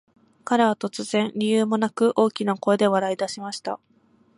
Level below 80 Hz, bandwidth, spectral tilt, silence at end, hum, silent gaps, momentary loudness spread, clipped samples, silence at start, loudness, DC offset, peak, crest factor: -72 dBFS; 11.5 kHz; -5 dB/octave; 0.6 s; none; none; 11 LU; under 0.1%; 0.45 s; -23 LUFS; under 0.1%; -6 dBFS; 18 dB